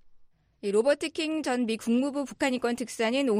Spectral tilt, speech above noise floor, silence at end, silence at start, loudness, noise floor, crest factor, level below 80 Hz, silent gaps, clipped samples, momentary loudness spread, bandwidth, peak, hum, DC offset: -4 dB/octave; 29 dB; 0 s; 0.05 s; -28 LUFS; -56 dBFS; 16 dB; -66 dBFS; none; under 0.1%; 5 LU; 15.5 kHz; -10 dBFS; none; under 0.1%